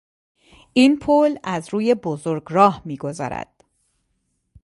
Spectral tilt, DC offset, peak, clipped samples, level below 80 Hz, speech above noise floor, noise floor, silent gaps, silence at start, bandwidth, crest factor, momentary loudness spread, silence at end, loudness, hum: -6 dB/octave; under 0.1%; 0 dBFS; under 0.1%; -56 dBFS; 52 dB; -71 dBFS; none; 0.75 s; 11.5 kHz; 20 dB; 13 LU; 1.2 s; -20 LUFS; none